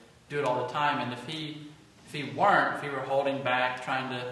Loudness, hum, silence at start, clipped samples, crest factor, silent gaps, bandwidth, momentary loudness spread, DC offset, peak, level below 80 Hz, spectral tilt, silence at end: -29 LUFS; none; 0 s; under 0.1%; 20 dB; none; 12.5 kHz; 13 LU; under 0.1%; -10 dBFS; -70 dBFS; -5 dB/octave; 0 s